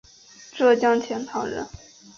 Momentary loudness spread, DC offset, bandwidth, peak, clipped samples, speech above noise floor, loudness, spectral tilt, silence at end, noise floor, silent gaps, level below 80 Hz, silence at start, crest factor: 18 LU; under 0.1%; 7.4 kHz; -8 dBFS; under 0.1%; 27 dB; -23 LUFS; -4.5 dB/octave; 0.5 s; -49 dBFS; none; -58 dBFS; 0.4 s; 16 dB